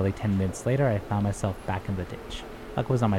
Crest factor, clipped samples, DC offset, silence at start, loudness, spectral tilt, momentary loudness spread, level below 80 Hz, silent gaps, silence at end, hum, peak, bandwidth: 16 dB; under 0.1%; under 0.1%; 0 s; -28 LUFS; -7 dB/octave; 11 LU; -44 dBFS; none; 0 s; none; -10 dBFS; 14 kHz